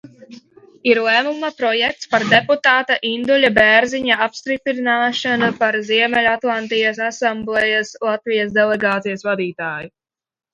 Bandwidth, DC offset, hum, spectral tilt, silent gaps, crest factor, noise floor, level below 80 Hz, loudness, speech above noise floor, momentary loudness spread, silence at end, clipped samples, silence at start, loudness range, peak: 10.5 kHz; under 0.1%; none; -4 dB/octave; none; 18 dB; -43 dBFS; -56 dBFS; -16 LUFS; 26 dB; 8 LU; 0.65 s; under 0.1%; 0.05 s; 4 LU; 0 dBFS